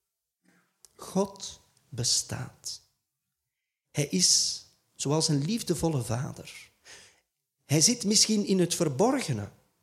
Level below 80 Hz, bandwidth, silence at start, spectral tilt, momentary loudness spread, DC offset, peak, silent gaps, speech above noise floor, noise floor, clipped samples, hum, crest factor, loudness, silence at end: -62 dBFS; 16 kHz; 1 s; -3.5 dB/octave; 20 LU; under 0.1%; -10 dBFS; none; 58 dB; -86 dBFS; under 0.1%; none; 20 dB; -26 LUFS; 0.35 s